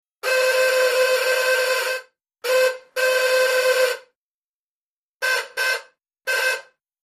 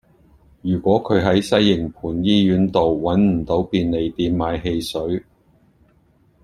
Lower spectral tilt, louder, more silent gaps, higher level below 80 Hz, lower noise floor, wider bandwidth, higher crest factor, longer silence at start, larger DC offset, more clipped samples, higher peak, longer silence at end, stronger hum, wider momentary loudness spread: second, 2.5 dB/octave vs -7 dB/octave; about the same, -20 LUFS vs -19 LUFS; first, 4.15-5.20 s vs none; second, -84 dBFS vs -44 dBFS; first, under -90 dBFS vs -57 dBFS; first, 15.5 kHz vs 12.5 kHz; about the same, 16 dB vs 18 dB; second, 0.25 s vs 0.65 s; neither; neither; second, -6 dBFS vs -2 dBFS; second, 0.45 s vs 1.25 s; neither; about the same, 9 LU vs 8 LU